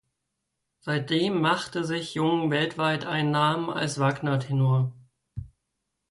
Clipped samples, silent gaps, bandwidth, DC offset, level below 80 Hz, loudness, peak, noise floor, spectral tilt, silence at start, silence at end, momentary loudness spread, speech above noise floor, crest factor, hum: under 0.1%; none; 11.5 kHz; under 0.1%; -60 dBFS; -26 LUFS; -12 dBFS; -81 dBFS; -6 dB/octave; 0.85 s; 0.65 s; 11 LU; 56 dB; 16 dB; none